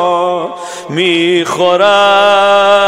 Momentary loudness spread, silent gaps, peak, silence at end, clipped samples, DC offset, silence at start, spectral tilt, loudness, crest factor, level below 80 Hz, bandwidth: 12 LU; none; 0 dBFS; 0 s; under 0.1%; under 0.1%; 0 s; -4 dB/octave; -9 LUFS; 10 dB; -58 dBFS; 14.5 kHz